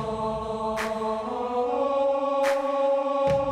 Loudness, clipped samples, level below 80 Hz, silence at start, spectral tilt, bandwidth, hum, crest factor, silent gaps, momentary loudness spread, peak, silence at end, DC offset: -26 LUFS; under 0.1%; -52 dBFS; 0 s; -5.5 dB/octave; 13.5 kHz; none; 14 dB; none; 5 LU; -12 dBFS; 0 s; under 0.1%